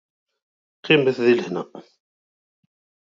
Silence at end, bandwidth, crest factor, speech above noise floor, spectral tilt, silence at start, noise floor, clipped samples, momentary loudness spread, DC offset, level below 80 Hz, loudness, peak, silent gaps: 1.25 s; 7.4 kHz; 20 dB; over 70 dB; -6.5 dB/octave; 0.85 s; under -90 dBFS; under 0.1%; 20 LU; under 0.1%; -72 dBFS; -20 LUFS; -4 dBFS; none